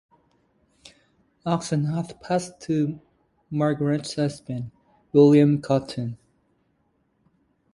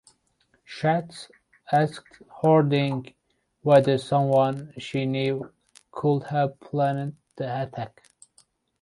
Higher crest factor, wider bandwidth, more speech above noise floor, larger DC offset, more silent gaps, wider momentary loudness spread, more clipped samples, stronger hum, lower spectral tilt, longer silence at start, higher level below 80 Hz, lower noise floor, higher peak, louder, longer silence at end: about the same, 20 dB vs 20 dB; about the same, 11.5 kHz vs 11.5 kHz; about the same, 46 dB vs 44 dB; neither; neither; about the same, 17 LU vs 18 LU; neither; neither; about the same, -7 dB/octave vs -7.5 dB/octave; first, 1.45 s vs 0.7 s; about the same, -62 dBFS vs -66 dBFS; about the same, -69 dBFS vs -68 dBFS; about the same, -6 dBFS vs -6 dBFS; about the same, -23 LUFS vs -24 LUFS; first, 1.6 s vs 0.95 s